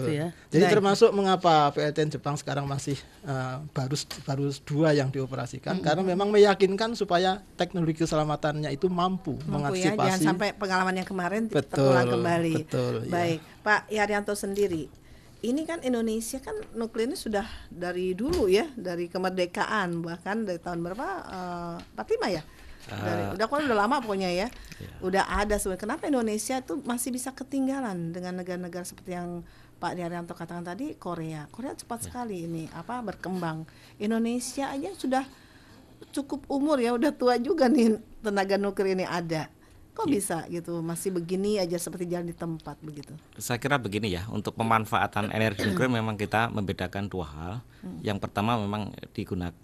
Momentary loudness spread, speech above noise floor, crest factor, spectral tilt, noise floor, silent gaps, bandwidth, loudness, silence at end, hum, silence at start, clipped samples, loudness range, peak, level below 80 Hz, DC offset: 13 LU; 25 dB; 20 dB; -5.5 dB/octave; -52 dBFS; none; 14.5 kHz; -28 LUFS; 0.1 s; none; 0 s; under 0.1%; 8 LU; -8 dBFS; -52 dBFS; under 0.1%